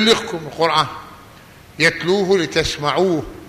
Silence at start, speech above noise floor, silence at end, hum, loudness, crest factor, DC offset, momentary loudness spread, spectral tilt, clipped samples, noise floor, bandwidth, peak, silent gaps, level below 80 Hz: 0 s; 25 dB; 0 s; none; -18 LUFS; 16 dB; under 0.1%; 7 LU; -4 dB/octave; under 0.1%; -43 dBFS; 15 kHz; -2 dBFS; none; -44 dBFS